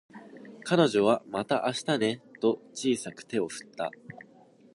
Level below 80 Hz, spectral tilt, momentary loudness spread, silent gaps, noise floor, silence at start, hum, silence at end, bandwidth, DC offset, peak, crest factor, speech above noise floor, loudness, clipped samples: -74 dBFS; -5 dB/octave; 23 LU; none; -57 dBFS; 0.15 s; none; 0.6 s; 11.5 kHz; under 0.1%; -8 dBFS; 22 dB; 29 dB; -29 LUFS; under 0.1%